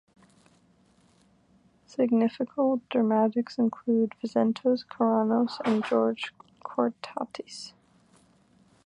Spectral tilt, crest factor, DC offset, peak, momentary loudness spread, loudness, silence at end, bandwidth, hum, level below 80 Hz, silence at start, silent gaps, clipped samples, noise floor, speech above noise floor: -6.5 dB/octave; 18 dB; under 0.1%; -10 dBFS; 14 LU; -27 LUFS; 1.15 s; 10 kHz; none; -76 dBFS; 2 s; none; under 0.1%; -63 dBFS; 37 dB